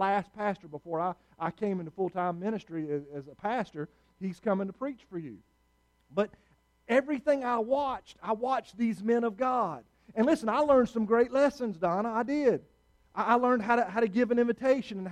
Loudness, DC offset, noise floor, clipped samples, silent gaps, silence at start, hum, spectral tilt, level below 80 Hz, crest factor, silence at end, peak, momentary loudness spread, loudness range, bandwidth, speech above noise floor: -30 LUFS; under 0.1%; -70 dBFS; under 0.1%; none; 0 s; none; -7 dB/octave; -66 dBFS; 18 dB; 0 s; -12 dBFS; 13 LU; 8 LU; 11 kHz; 40 dB